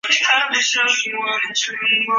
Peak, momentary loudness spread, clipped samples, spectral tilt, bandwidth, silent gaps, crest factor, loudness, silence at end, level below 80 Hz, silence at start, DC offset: -2 dBFS; 6 LU; under 0.1%; 1.5 dB/octave; 8 kHz; none; 16 dB; -16 LUFS; 0 s; -74 dBFS; 0.05 s; under 0.1%